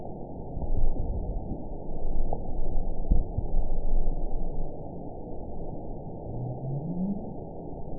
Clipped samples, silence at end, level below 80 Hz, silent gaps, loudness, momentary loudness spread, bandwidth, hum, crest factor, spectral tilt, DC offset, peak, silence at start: under 0.1%; 0 s; -28 dBFS; none; -35 LUFS; 9 LU; 1 kHz; none; 14 dB; -17 dB/octave; 0.6%; -10 dBFS; 0 s